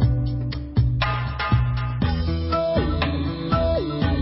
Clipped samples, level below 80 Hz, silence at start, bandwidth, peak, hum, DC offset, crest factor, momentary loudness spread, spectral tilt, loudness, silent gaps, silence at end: under 0.1%; -28 dBFS; 0 s; 5.8 kHz; -8 dBFS; none; under 0.1%; 14 dB; 4 LU; -11.5 dB/octave; -23 LUFS; none; 0 s